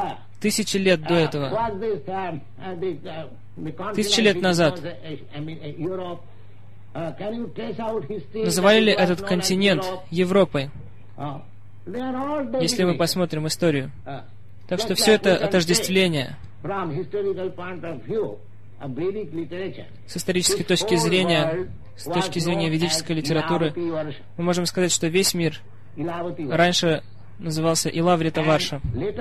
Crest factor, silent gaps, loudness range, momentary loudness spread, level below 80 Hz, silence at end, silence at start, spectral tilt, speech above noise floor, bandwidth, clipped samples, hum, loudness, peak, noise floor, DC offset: 18 dB; none; 6 LU; 16 LU; -50 dBFS; 0 s; 0 s; -4.5 dB/octave; 24 dB; 14 kHz; under 0.1%; none; -22 LUFS; -6 dBFS; -47 dBFS; 1%